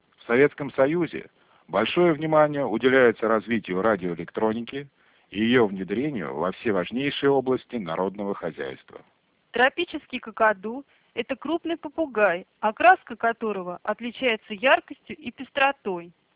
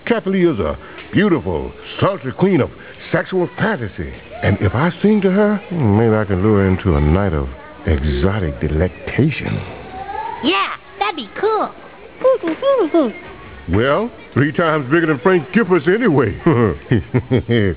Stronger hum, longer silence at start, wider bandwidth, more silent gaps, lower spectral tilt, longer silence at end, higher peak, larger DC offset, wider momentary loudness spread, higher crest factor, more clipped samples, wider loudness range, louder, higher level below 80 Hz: neither; first, 0.3 s vs 0.05 s; about the same, 4 kHz vs 4 kHz; neither; second, -9 dB/octave vs -11 dB/octave; first, 0.25 s vs 0 s; second, -4 dBFS vs 0 dBFS; second, under 0.1% vs 0.4%; first, 14 LU vs 11 LU; about the same, 20 dB vs 16 dB; neither; about the same, 5 LU vs 4 LU; second, -24 LUFS vs -17 LUFS; second, -62 dBFS vs -30 dBFS